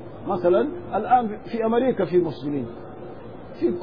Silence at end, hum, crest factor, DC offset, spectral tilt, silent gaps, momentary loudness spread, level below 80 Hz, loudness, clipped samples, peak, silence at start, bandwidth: 0 s; none; 16 dB; 0.6%; -10 dB/octave; none; 18 LU; -54 dBFS; -23 LUFS; under 0.1%; -6 dBFS; 0 s; 5.2 kHz